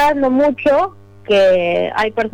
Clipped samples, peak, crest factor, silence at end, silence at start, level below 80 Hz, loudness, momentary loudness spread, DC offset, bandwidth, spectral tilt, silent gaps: under 0.1%; -4 dBFS; 10 dB; 0.05 s; 0 s; -48 dBFS; -15 LUFS; 6 LU; under 0.1%; 16 kHz; -5.5 dB/octave; none